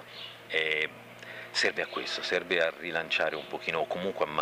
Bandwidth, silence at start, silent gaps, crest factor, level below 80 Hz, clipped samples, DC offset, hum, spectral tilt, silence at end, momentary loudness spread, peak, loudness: 15.5 kHz; 0 s; none; 22 dB; -72 dBFS; under 0.1%; under 0.1%; none; -2.5 dB/octave; 0 s; 15 LU; -10 dBFS; -30 LUFS